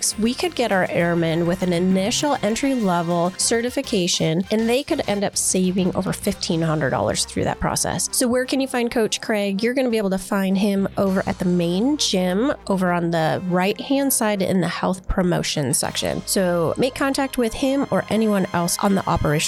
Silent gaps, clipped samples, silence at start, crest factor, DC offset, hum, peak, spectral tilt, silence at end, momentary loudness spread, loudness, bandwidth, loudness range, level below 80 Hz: none; under 0.1%; 0 s; 12 dB; under 0.1%; none; -8 dBFS; -4.5 dB/octave; 0 s; 3 LU; -21 LUFS; 14 kHz; 1 LU; -42 dBFS